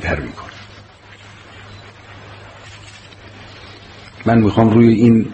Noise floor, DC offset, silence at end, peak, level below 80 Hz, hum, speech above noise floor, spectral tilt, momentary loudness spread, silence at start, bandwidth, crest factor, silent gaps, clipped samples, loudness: -41 dBFS; under 0.1%; 0 s; 0 dBFS; -40 dBFS; none; 29 dB; -8.5 dB/octave; 27 LU; 0 s; 8.4 kHz; 16 dB; none; under 0.1%; -13 LUFS